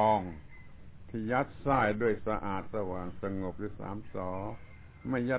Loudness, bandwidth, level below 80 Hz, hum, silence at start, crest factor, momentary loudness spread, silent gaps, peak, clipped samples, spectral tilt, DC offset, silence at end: -34 LUFS; 4 kHz; -52 dBFS; none; 0 s; 20 dB; 18 LU; none; -12 dBFS; under 0.1%; -6 dB/octave; under 0.1%; 0 s